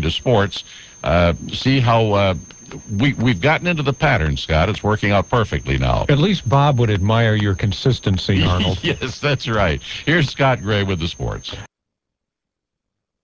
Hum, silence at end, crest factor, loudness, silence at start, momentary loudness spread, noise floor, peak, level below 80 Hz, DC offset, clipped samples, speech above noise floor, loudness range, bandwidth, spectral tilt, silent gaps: none; 1.55 s; 16 dB; -18 LUFS; 0 s; 10 LU; -82 dBFS; -2 dBFS; -32 dBFS; under 0.1%; under 0.1%; 65 dB; 3 LU; 8 kHz; -6 dB/octave; none